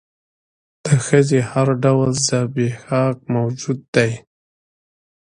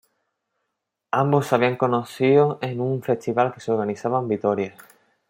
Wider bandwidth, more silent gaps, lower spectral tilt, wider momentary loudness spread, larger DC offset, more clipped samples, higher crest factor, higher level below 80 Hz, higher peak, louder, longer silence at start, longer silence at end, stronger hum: second, 10.5 kHz vs 16.5 kHz; first, 3.88-3.93 s vs none; second, -5.5 dB/octave vs -7 dB/octave; about the same, 7 LU vs 7 LU; neither; neither; about the same, 18 dB vs 20 dB; first, -54 dBFS vs -68 dBFS; about the same, 0 dBFS vs -2 dBFS; first, -18 LUFS vs -22 LUFS; second, 0.85 s vs 1.15 s; first, 1.15 s vs 0.6 s; neither